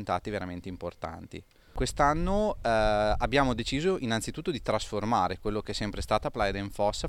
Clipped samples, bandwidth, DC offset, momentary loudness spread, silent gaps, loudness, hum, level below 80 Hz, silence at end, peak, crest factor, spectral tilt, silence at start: under 0.1%; 15.5 kHz; under 0.1%; 13 LU; none; -29 LUFS; none; -40 dBFS; 0 s; -10 dBFS; 20 dB; -5 dB/octave; 0 s